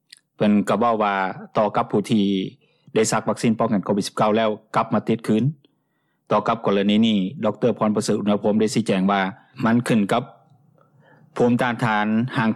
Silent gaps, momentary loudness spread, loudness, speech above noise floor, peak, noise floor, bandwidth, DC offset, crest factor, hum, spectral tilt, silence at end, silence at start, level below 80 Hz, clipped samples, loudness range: none; 6 LU; -21 LUFS; 50 dB; -8 dBFS; -70 dBFS; 12.5 kHz; under 0.1%; 14 dB; none; -6 dB/octave; 0 s; 0.4 s; -62 dBFS; under 0.1%; 2 LU